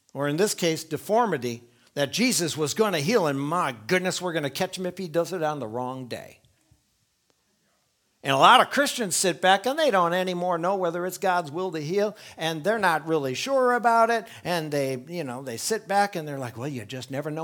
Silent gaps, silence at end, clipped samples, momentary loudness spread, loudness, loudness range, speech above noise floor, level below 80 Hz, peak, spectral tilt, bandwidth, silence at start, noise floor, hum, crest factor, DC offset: none; 0 s; under 0.1%; 12 LU; -25 LUFS; 8 LU; 46 dB; -72 dBFS; -4 dBFS; -3.5 dB/octave; 19.5 kHz; 0.15 s; -70 dBFS; none; 22 dB; under 0.1%